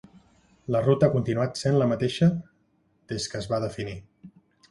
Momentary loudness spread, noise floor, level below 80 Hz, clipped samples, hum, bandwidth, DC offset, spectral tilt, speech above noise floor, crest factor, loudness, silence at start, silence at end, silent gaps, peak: 14 LU; -67 dBFS; -56 dBFS; under 0.1%; none; 11.5 kHz; under 0.1%; -6.5 dB/octave; 43 dB; 20 dB; -25 LUFS; 0.7 s; 0.4 s; none; -6 dBFS